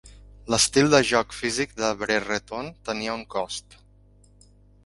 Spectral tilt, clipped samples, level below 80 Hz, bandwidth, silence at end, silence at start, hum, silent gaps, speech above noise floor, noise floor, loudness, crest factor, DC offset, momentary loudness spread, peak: -3 dB/octave; under 0.1%; -52 dBFS; 11.5 kHz; 1.25 s; 0.05 s; 50 Hz at -50 dBFS; none; 31 dB; -55 dBFS; -24 LUFS; 24 dB; under 0.1%; 15 LU; -2 dBFS